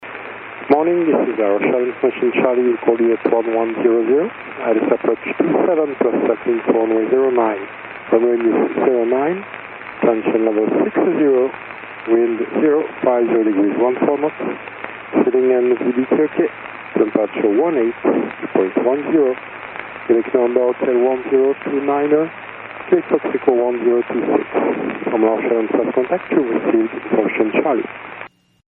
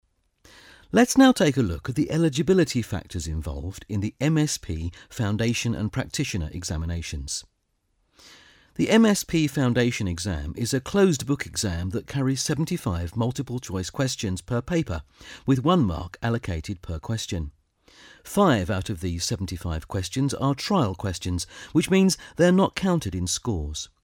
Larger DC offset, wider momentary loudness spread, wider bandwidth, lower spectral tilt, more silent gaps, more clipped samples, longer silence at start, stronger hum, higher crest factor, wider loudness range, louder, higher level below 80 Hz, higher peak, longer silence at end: neither; about the same, 12 LU vs 11 LU; second, 3.9 kHz vs 17.5 kHz; about the same, -5.5 dB/octave vs -5.5 dB/octave; neither; neither; second, 0 s vs 0.95 s; neither; about the same, 16 dB vs 20 dB; second, 1 LU vs 5 LU; first, -17 LUFS vs -25 LUFS; second, -64 dBFS vs -42 dBFS; first, 0 dBFS vs -4 dBFS; first, 0.4 s vs 0.15 s